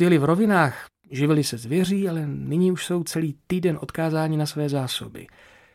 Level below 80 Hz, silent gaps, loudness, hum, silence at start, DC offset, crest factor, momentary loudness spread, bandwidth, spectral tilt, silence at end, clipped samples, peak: -58 dBFS; none; -23 LUFS; none; 0 s; under 0.1%; 18 dB; 10 LU; 16 kHz; -6 dB/octave; 0.5 s; under 0.1%; -6 dBFS